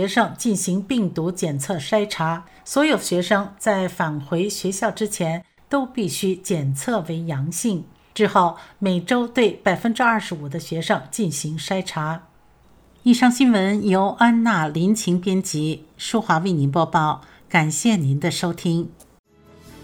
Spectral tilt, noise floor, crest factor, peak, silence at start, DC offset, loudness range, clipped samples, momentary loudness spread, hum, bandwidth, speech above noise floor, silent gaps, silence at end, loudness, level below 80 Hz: -5 dB/octave; -53 dBFS; 18 dB; -4 dBFS; 0 s; under 0.1%; 5 LU; under 0.1%; 9 LU; none; 20 kHz; 33 dB; 19.19-19.24 s; 0 s; -21 LUFS; -58 dBFS